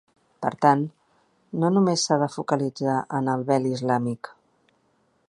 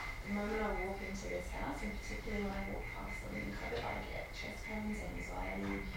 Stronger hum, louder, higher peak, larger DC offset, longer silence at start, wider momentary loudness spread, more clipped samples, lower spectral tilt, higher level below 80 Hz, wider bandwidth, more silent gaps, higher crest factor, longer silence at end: neither; first, -24 LUFS vs -42 LUFS; first, -2 dBFS vs -26 dBFS; neither; first, 0.4 s vs 0 s; first, 11 LU vs 5 LU; neither; about the same, -5.5 dB/octave vs -5.5 dB/octave; second, -70 dBFS vs -48 dBFS; second, 11.5 kHz vs 17 kHz; neither; first, 22 dB vs 14 dB; first, 1 s vs 0 s